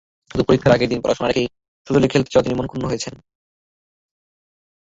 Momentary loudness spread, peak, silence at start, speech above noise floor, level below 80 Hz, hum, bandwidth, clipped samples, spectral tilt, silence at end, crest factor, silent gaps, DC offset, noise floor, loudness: 11 LU; -2 dBFS; 0.35 s; over 72 dB; -44 dBFS; none; 8 kHz; under 0.1%; -6 dB/octave; 1.7 s; 18 dB; 1.68-1.85 s; under 0.1%; under -90 dBFS; -19 LUFS